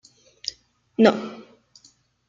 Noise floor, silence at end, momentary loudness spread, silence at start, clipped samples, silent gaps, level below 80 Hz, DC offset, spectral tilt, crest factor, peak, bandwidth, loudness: -59 dBFS; 0.9 s; 19 LU; 0.45 s; under 0.1%; none; -68 dBFS; under 0.1%; -5 dB/octave; 24 dB; -2 dBFS; 7.6 kHz; -23 LUFS